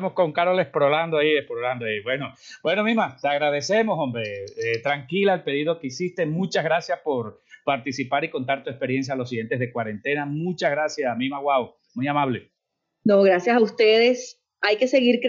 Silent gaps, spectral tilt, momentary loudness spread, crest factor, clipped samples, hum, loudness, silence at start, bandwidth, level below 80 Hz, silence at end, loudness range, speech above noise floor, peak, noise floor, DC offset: none; -5.5 dB/octave; 10 LU; 16 dB; under 0.1%; none; -23 LUFS; 0 s; 7.6 kHz; -72 dBFS; 0 s; 5 LU; 57 dB; -6 dBFS; -80 dBFS; under 0.1%